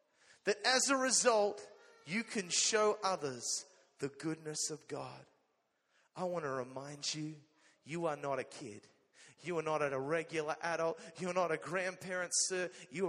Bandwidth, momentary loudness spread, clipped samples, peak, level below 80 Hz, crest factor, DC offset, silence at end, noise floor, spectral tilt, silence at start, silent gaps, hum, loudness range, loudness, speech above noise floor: 13 kHz; 16 LU; under 0.1%; -16 dBFS; -84 dBFS; 22 dB; under 0.1%; 0 s; -80 dBFS; -2.5 dB/octave; 0.45 s; none; none; 10 LU; -36 LUFS; 43 dB